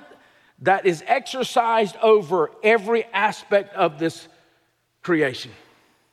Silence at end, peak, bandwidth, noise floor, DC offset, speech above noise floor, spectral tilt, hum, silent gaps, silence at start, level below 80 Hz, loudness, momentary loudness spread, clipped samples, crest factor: 0.6 s; -6 dBFS; 13.5 kHz; -66 dBFS; under 0.1%; 46 dB; -4.5 dB/octave; none; none; 0.6 s; -74 dBFS; -21 LUFS; 10 LU; under 0.1%; 16 dB